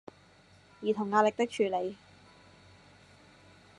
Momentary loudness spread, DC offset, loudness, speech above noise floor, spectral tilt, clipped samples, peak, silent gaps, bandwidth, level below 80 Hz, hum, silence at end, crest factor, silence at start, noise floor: 12 LU; under 0.1%; -30 LUFS; 31 dB; -5 dB/octave; under 0.1%; -12 dBFS; none; 11 kHz; -74 dBFS; none; 1.85 s; 22 dB; 0.8 s; -60 dBFS